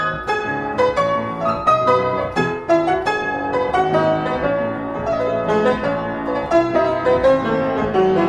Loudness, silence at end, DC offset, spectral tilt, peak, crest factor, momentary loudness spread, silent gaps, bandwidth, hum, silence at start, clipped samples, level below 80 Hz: -18 LUFS; 0 s; under 0.1%; -6.5 dB/octave; -4 dBFS; 14 dB; 6 LU; none; 10.5 kHz; none; 0 s; under 0.1%; -44 dBFS